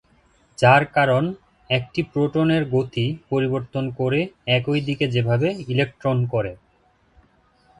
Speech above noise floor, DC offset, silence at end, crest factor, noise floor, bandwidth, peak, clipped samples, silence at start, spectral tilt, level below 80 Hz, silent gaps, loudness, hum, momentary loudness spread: 40 dB; under 0.1%; 1.25 s; 22 dB; -60 dBFS; 10.5 kHz; 0 dBFS; under 0.1%; 0.6 s; -7 dB/octave; -54 dBFS; none; -21 LUFS; none; 9 LU